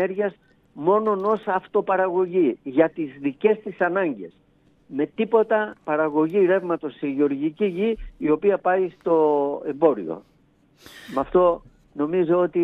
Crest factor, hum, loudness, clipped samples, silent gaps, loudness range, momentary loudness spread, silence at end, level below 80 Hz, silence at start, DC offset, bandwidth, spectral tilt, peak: 18 dB; none; -22 LUFS; under 0.1%; none; 2 LU; 9 LU; 0 s; -52 dBFS; 0 s; under 0.1%; 6.2 kHz; -8.5 dB/octave; -4 dBFS